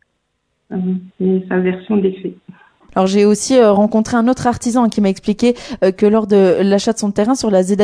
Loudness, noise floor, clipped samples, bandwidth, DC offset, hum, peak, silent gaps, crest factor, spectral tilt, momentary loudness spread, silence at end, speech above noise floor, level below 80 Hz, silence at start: -15 LUFS; -68 dBFS; under 0.1%; 11 kHz; under 0.1%; none; 0 dBFS; none; 14 dB; -6 dB/octave; 9 LU; 0 s; 54 dB; -48 dBFS; 0.7 s